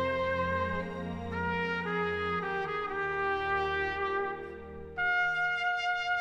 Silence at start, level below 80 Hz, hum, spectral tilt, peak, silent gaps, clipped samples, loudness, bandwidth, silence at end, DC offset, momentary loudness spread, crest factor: 0 s; -54 dBFS; none; -5.5 dB/octave; -20 dBFS; none; under 0.1%; -31 LUFS; 10 kHz; 0 s; under 0.1%; 8 LU; 12 dB